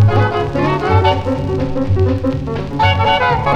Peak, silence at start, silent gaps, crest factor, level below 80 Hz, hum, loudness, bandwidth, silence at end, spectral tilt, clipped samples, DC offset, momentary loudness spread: 0 dBFS; 0 s; none; 14 dB; -30 dBFS; none; -15 LUFS; 7.2 kHz; 0 s; -7.5 dB/octave; under 0.1%; under 0.1%; 6 LU